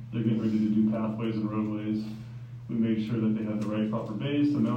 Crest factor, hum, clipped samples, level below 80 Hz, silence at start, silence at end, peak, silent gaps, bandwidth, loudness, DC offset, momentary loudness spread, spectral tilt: 14 dB; none; under 0.1%; -62 dBFS; 0 s; 0 s; -14 dBFS; none; 6.8 kHz; -29 LUFS; under 0.1%; 9 LU; -9 dB/octave